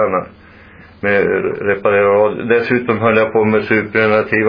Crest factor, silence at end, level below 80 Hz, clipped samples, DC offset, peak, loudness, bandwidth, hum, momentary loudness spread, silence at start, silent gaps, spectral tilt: 14 dB; 0 s; -50 dBFS; under 0.1%; under 0.1%; 0 dBFS; -14 LUFS; 5.2 kHz; none; 5 LU; 0 s; none; -9 dB/octave